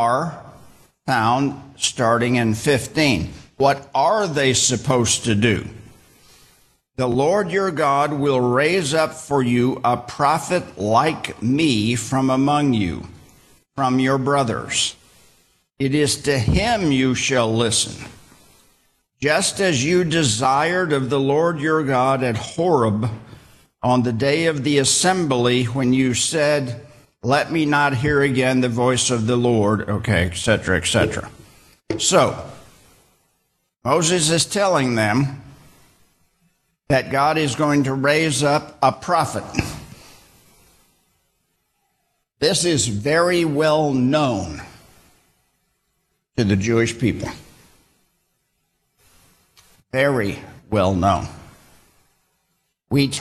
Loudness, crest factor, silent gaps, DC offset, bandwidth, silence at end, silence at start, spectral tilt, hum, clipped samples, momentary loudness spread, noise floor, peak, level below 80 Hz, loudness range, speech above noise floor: -19 LUFS; 16 dB; none; under 0.1%; 13 kHz; 0 s; 0 s; -4.5 dB/octave; none; under 0.1%; 9 LU; -70 dBFS; -4 dBFS; -46 dBFS; 6 LU; 52 dB